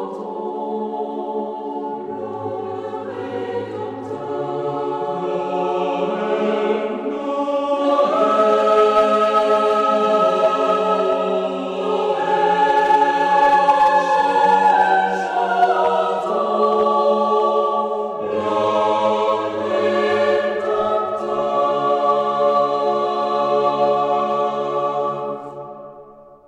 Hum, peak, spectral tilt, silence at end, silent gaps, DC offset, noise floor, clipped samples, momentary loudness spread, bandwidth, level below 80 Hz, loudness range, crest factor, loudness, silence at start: none; -4 dBFS; -5.5 dB/octave; 0.1 s; none; under 0.1%; -43 dBFS; under 0.1%; 12 LU; 10 kHz; -62 dBFS; 10 LU; 14 dB; -18 LUFS; 0 s